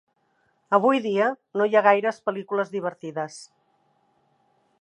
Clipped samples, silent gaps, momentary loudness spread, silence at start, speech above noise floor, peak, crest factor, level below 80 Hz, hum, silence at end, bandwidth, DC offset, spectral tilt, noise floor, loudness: under 0.1%; none; 14 LU; 0.7 s; 46 dB; -4 dBFS; 20 dB; -80 dBFS; none; 1.35 s; 11 kHz; under 0.1%; -5.5 dB/octave; -68 dBFS; -23 LUFS